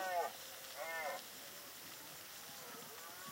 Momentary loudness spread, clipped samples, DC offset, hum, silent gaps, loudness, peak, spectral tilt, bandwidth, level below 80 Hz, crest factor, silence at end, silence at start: 8 LU; under 0.1%; under 0.1%; none; none; -47 LUFS; -30 dBFS; -1 dB/octave; 16 kHz; -86 dBFS; 18 dB; 0 s; 0 s